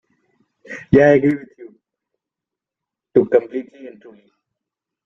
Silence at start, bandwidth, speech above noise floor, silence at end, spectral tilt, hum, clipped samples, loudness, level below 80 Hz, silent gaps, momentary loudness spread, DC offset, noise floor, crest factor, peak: 0.7 s; 7 kHz; 70 dB; 1.15 s; -8.5 dB/octave; none; under 0.1%; -16 LUFS; -50 dBFS; none; 23 LU; under 0.1%; -86 dBFS; 18 dB; -2 dBFS